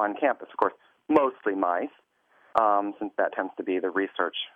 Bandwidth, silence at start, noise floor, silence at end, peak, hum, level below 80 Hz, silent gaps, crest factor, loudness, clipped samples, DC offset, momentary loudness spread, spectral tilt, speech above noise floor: 5.2 kHz; 0 s; -63 dBFS; 0.1 s; -6 dBFS; none; -72 dBFS; none; 20 dB; -27 LUFS; under 0.1%; under 0.1%; 7 LU; -6 dB/octave; 36 dB